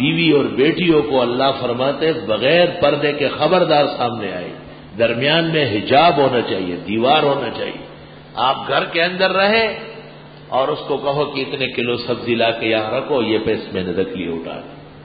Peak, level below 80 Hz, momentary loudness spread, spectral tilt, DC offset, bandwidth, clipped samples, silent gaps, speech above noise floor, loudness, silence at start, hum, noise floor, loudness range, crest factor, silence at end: -2 dBFS; -50 dBFS; 13 LU; -10.5 dB/octave; under 0.1%; 5 kHz; under 0.1%; none; 21 dB; -17 LUFS; 0 s; none; -38 dBFS; 3 LU; 16 dB; 0 s